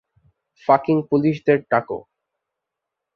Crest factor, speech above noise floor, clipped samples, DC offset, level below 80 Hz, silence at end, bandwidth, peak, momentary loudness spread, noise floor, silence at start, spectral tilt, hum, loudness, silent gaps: 20 dB; 65 dB; under 0.1%; under 0.1%; -64 dBFS; 1.15 s; 6.4 kHz; -2 dBFS; 13 LU; -83 dBFS; 0.7 s; -9 dB/octave; none; -19 LUFS; none